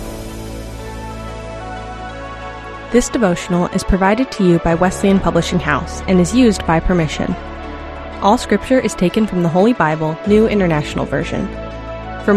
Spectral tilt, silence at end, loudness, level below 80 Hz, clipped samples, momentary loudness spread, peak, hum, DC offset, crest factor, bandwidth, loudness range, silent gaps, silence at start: -6 dB/octave; 0 s; -15 LUFS; -30 dBFS; under 0.1%; 15 LU; 0 dBFS; none; under 0.1%; 16 dB; 13.5 kHz; 6 LU; none; 0 s